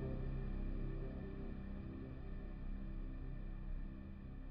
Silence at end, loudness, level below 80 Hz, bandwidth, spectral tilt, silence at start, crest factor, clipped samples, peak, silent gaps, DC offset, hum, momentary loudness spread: 0 s; -49 LUFS; -46 dBFS; 4.3 kHz; -9 dB/octave; 0 s; 12 dB; under 0.1%; -32 dBFS; none; under 0.1%; none; 5 LU